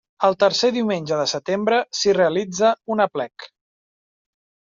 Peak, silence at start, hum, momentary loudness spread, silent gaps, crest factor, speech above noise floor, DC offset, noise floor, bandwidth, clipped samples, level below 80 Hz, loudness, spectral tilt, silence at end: -4 dBFS; 0.2 s; none; 5 LU; none; 18 dB; over 70 dB; under 0.1%; under -90 dBFS; 7.6 kHz; under 0.1%; -66 dBFS; -20 LUFS; -3 dB/octave; 1.3 s